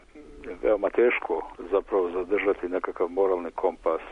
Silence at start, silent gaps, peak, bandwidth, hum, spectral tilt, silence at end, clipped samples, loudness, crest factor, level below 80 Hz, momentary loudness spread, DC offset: 0.15 s; none; -12 dBFS; 5.8 kHz; none; -6.5 dB/octave; 0 s; under 0.1%; -26 LUFS; 14 dB; -52 dBFS; 8 LU; under 0.1%